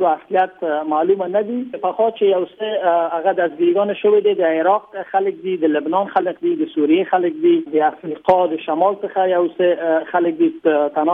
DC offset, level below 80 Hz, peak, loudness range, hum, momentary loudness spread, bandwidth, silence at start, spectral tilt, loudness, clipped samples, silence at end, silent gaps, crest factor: under 0.1%; -66 dBFS; -2 dBFS; 1 LU; none; 5 LU; 3.8 kHz; 0 s; -8.5 dB/octave; -18 LUFS; under 0.1%; 0 s; none; 14 dB